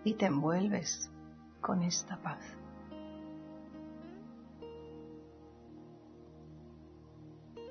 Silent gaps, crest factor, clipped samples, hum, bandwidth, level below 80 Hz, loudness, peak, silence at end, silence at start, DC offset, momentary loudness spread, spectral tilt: none; 22 dB; under 0.1%; none; 6.4 kHz; -66 dBFS; -37 LUFS; -18 dBFS; 0 s; 0 s; under 0.1%; 23 LU; -5.5 dB/octave